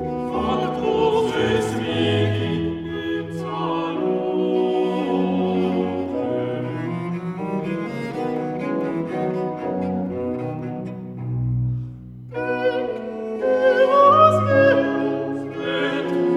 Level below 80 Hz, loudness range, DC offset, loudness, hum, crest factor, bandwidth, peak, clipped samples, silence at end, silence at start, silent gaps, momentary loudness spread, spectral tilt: -50 dBFS; 8 LU; under 0.1%; -21 LUFS; none; 18 dB; 12 kHz; -2 dBFS; under 0.1%; 0 s; 0 s; none; 12 LU; -7 dB/octave